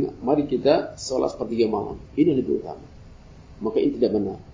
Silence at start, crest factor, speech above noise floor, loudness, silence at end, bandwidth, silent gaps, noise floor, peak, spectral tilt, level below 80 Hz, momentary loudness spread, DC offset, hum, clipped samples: 0 s; 18 dB; 22 dB; -23 LUFS; 0 s; 7.6 kHz; none; -45 dBFS; -4 dBFS; -6.5 dB/octave; -48 dBFS; 9 LU; under 0.1%; none; under 0.1%